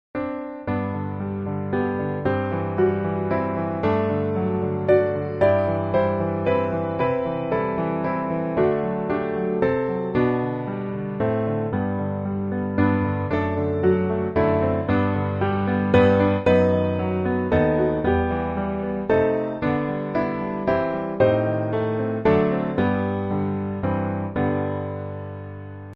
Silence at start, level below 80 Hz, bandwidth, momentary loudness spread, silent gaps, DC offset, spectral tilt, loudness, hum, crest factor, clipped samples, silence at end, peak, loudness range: 0.15 s; -46 dBFS; 5.4 kHz; 7 LU; none; under 0.1%; -7.5 dB/octave; -23 LUFS; none; 18 dB; under 0.1%; 0 s; -4 dBFS; 4 LU